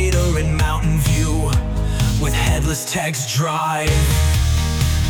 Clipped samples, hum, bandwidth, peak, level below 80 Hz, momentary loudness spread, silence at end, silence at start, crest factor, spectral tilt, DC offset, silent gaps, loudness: under 0.1%; none; 19 kHz; -6 dBFS; -22 dBFS; 4 LU; 0 s; 0 s; 10 dB; -4.5 dB/octave; under 0.1%; none; -18 LUFS